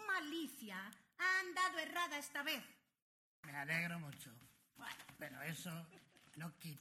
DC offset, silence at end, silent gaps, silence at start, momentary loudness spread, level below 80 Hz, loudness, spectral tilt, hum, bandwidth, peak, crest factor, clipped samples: under 0.1%; 0 s; 3.02-3.43 s; 0 s; 18 LU; -86 dBFS; -43 LUFS; -3 dB/octave; none; 16 kHz; -26 dBFS; 20 dB; under 0.1%